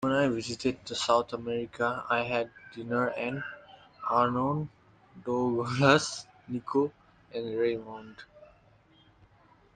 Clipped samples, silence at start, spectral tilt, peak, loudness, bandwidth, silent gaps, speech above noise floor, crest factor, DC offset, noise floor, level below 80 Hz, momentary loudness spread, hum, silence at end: under 0.1%; 0 s; -5 dB/octave; -8 dBFS; -30 LUFS; 9.8 kHz; none; 32 dB; 24 dB; under 0.1%; -61 dBFS; -64 dBFS; 16 LU; none; 1.3 s